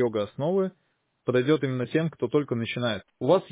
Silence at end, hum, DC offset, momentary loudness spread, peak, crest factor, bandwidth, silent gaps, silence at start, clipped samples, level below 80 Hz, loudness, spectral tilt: 0.05 s; none; under 0.1%; 6 LU; -10 dBFS; 16 dB; 4 kHz; none; 0 s; under 0.1%; -64 dBFS; -27 LUFS; -11 dB/octave